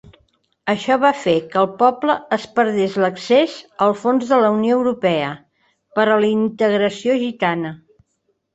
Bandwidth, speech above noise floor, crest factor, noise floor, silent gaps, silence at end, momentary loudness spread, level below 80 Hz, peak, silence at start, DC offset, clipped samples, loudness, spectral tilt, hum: 8.2 kHz; 52 dB; 16 dB; -69 dBFS; none; 0.8 s; 7 LU; -62 dBFS; -2 dBFS; 0.65 s; under 0.1%; under 0.1%; -18 LUFS; -6 dB/octave; none